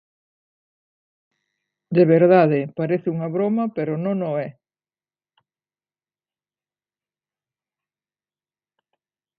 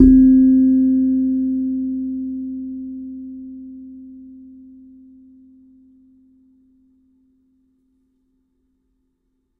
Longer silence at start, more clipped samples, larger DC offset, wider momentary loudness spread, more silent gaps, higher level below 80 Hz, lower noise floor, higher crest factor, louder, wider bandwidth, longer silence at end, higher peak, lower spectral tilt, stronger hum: first, 1.9 s vs 0 s; neither; neither; second, 11 LU vs 27 LU; neither; second, -72 dBFS vs -38 dBFS; first, under -90 dBFS vs -69 dBFS; about the same, 20 dB vs 20 dB; second, -20 LUFS vs -17 LUFS; first, 5 kHz vs 1.8 kHz; second, 4.9 s vs 5.25 s; second, -4 dBFS vs 0 dBFS; about the same, -12.5 dB/octave vs -12 dB/octave; first, 50 Hz at -50 dBFS vs none